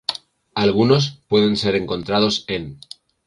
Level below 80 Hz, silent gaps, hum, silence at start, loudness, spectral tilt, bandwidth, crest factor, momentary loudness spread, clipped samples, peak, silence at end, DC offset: -50 dBFS; none; none; 0.1 s; -19 LUFS; -5.5 dB/octave; 11.5 kHz; 16 dB; 15 LU; under 0.1%; -4 dBFS; 0.5 s; under 0.1%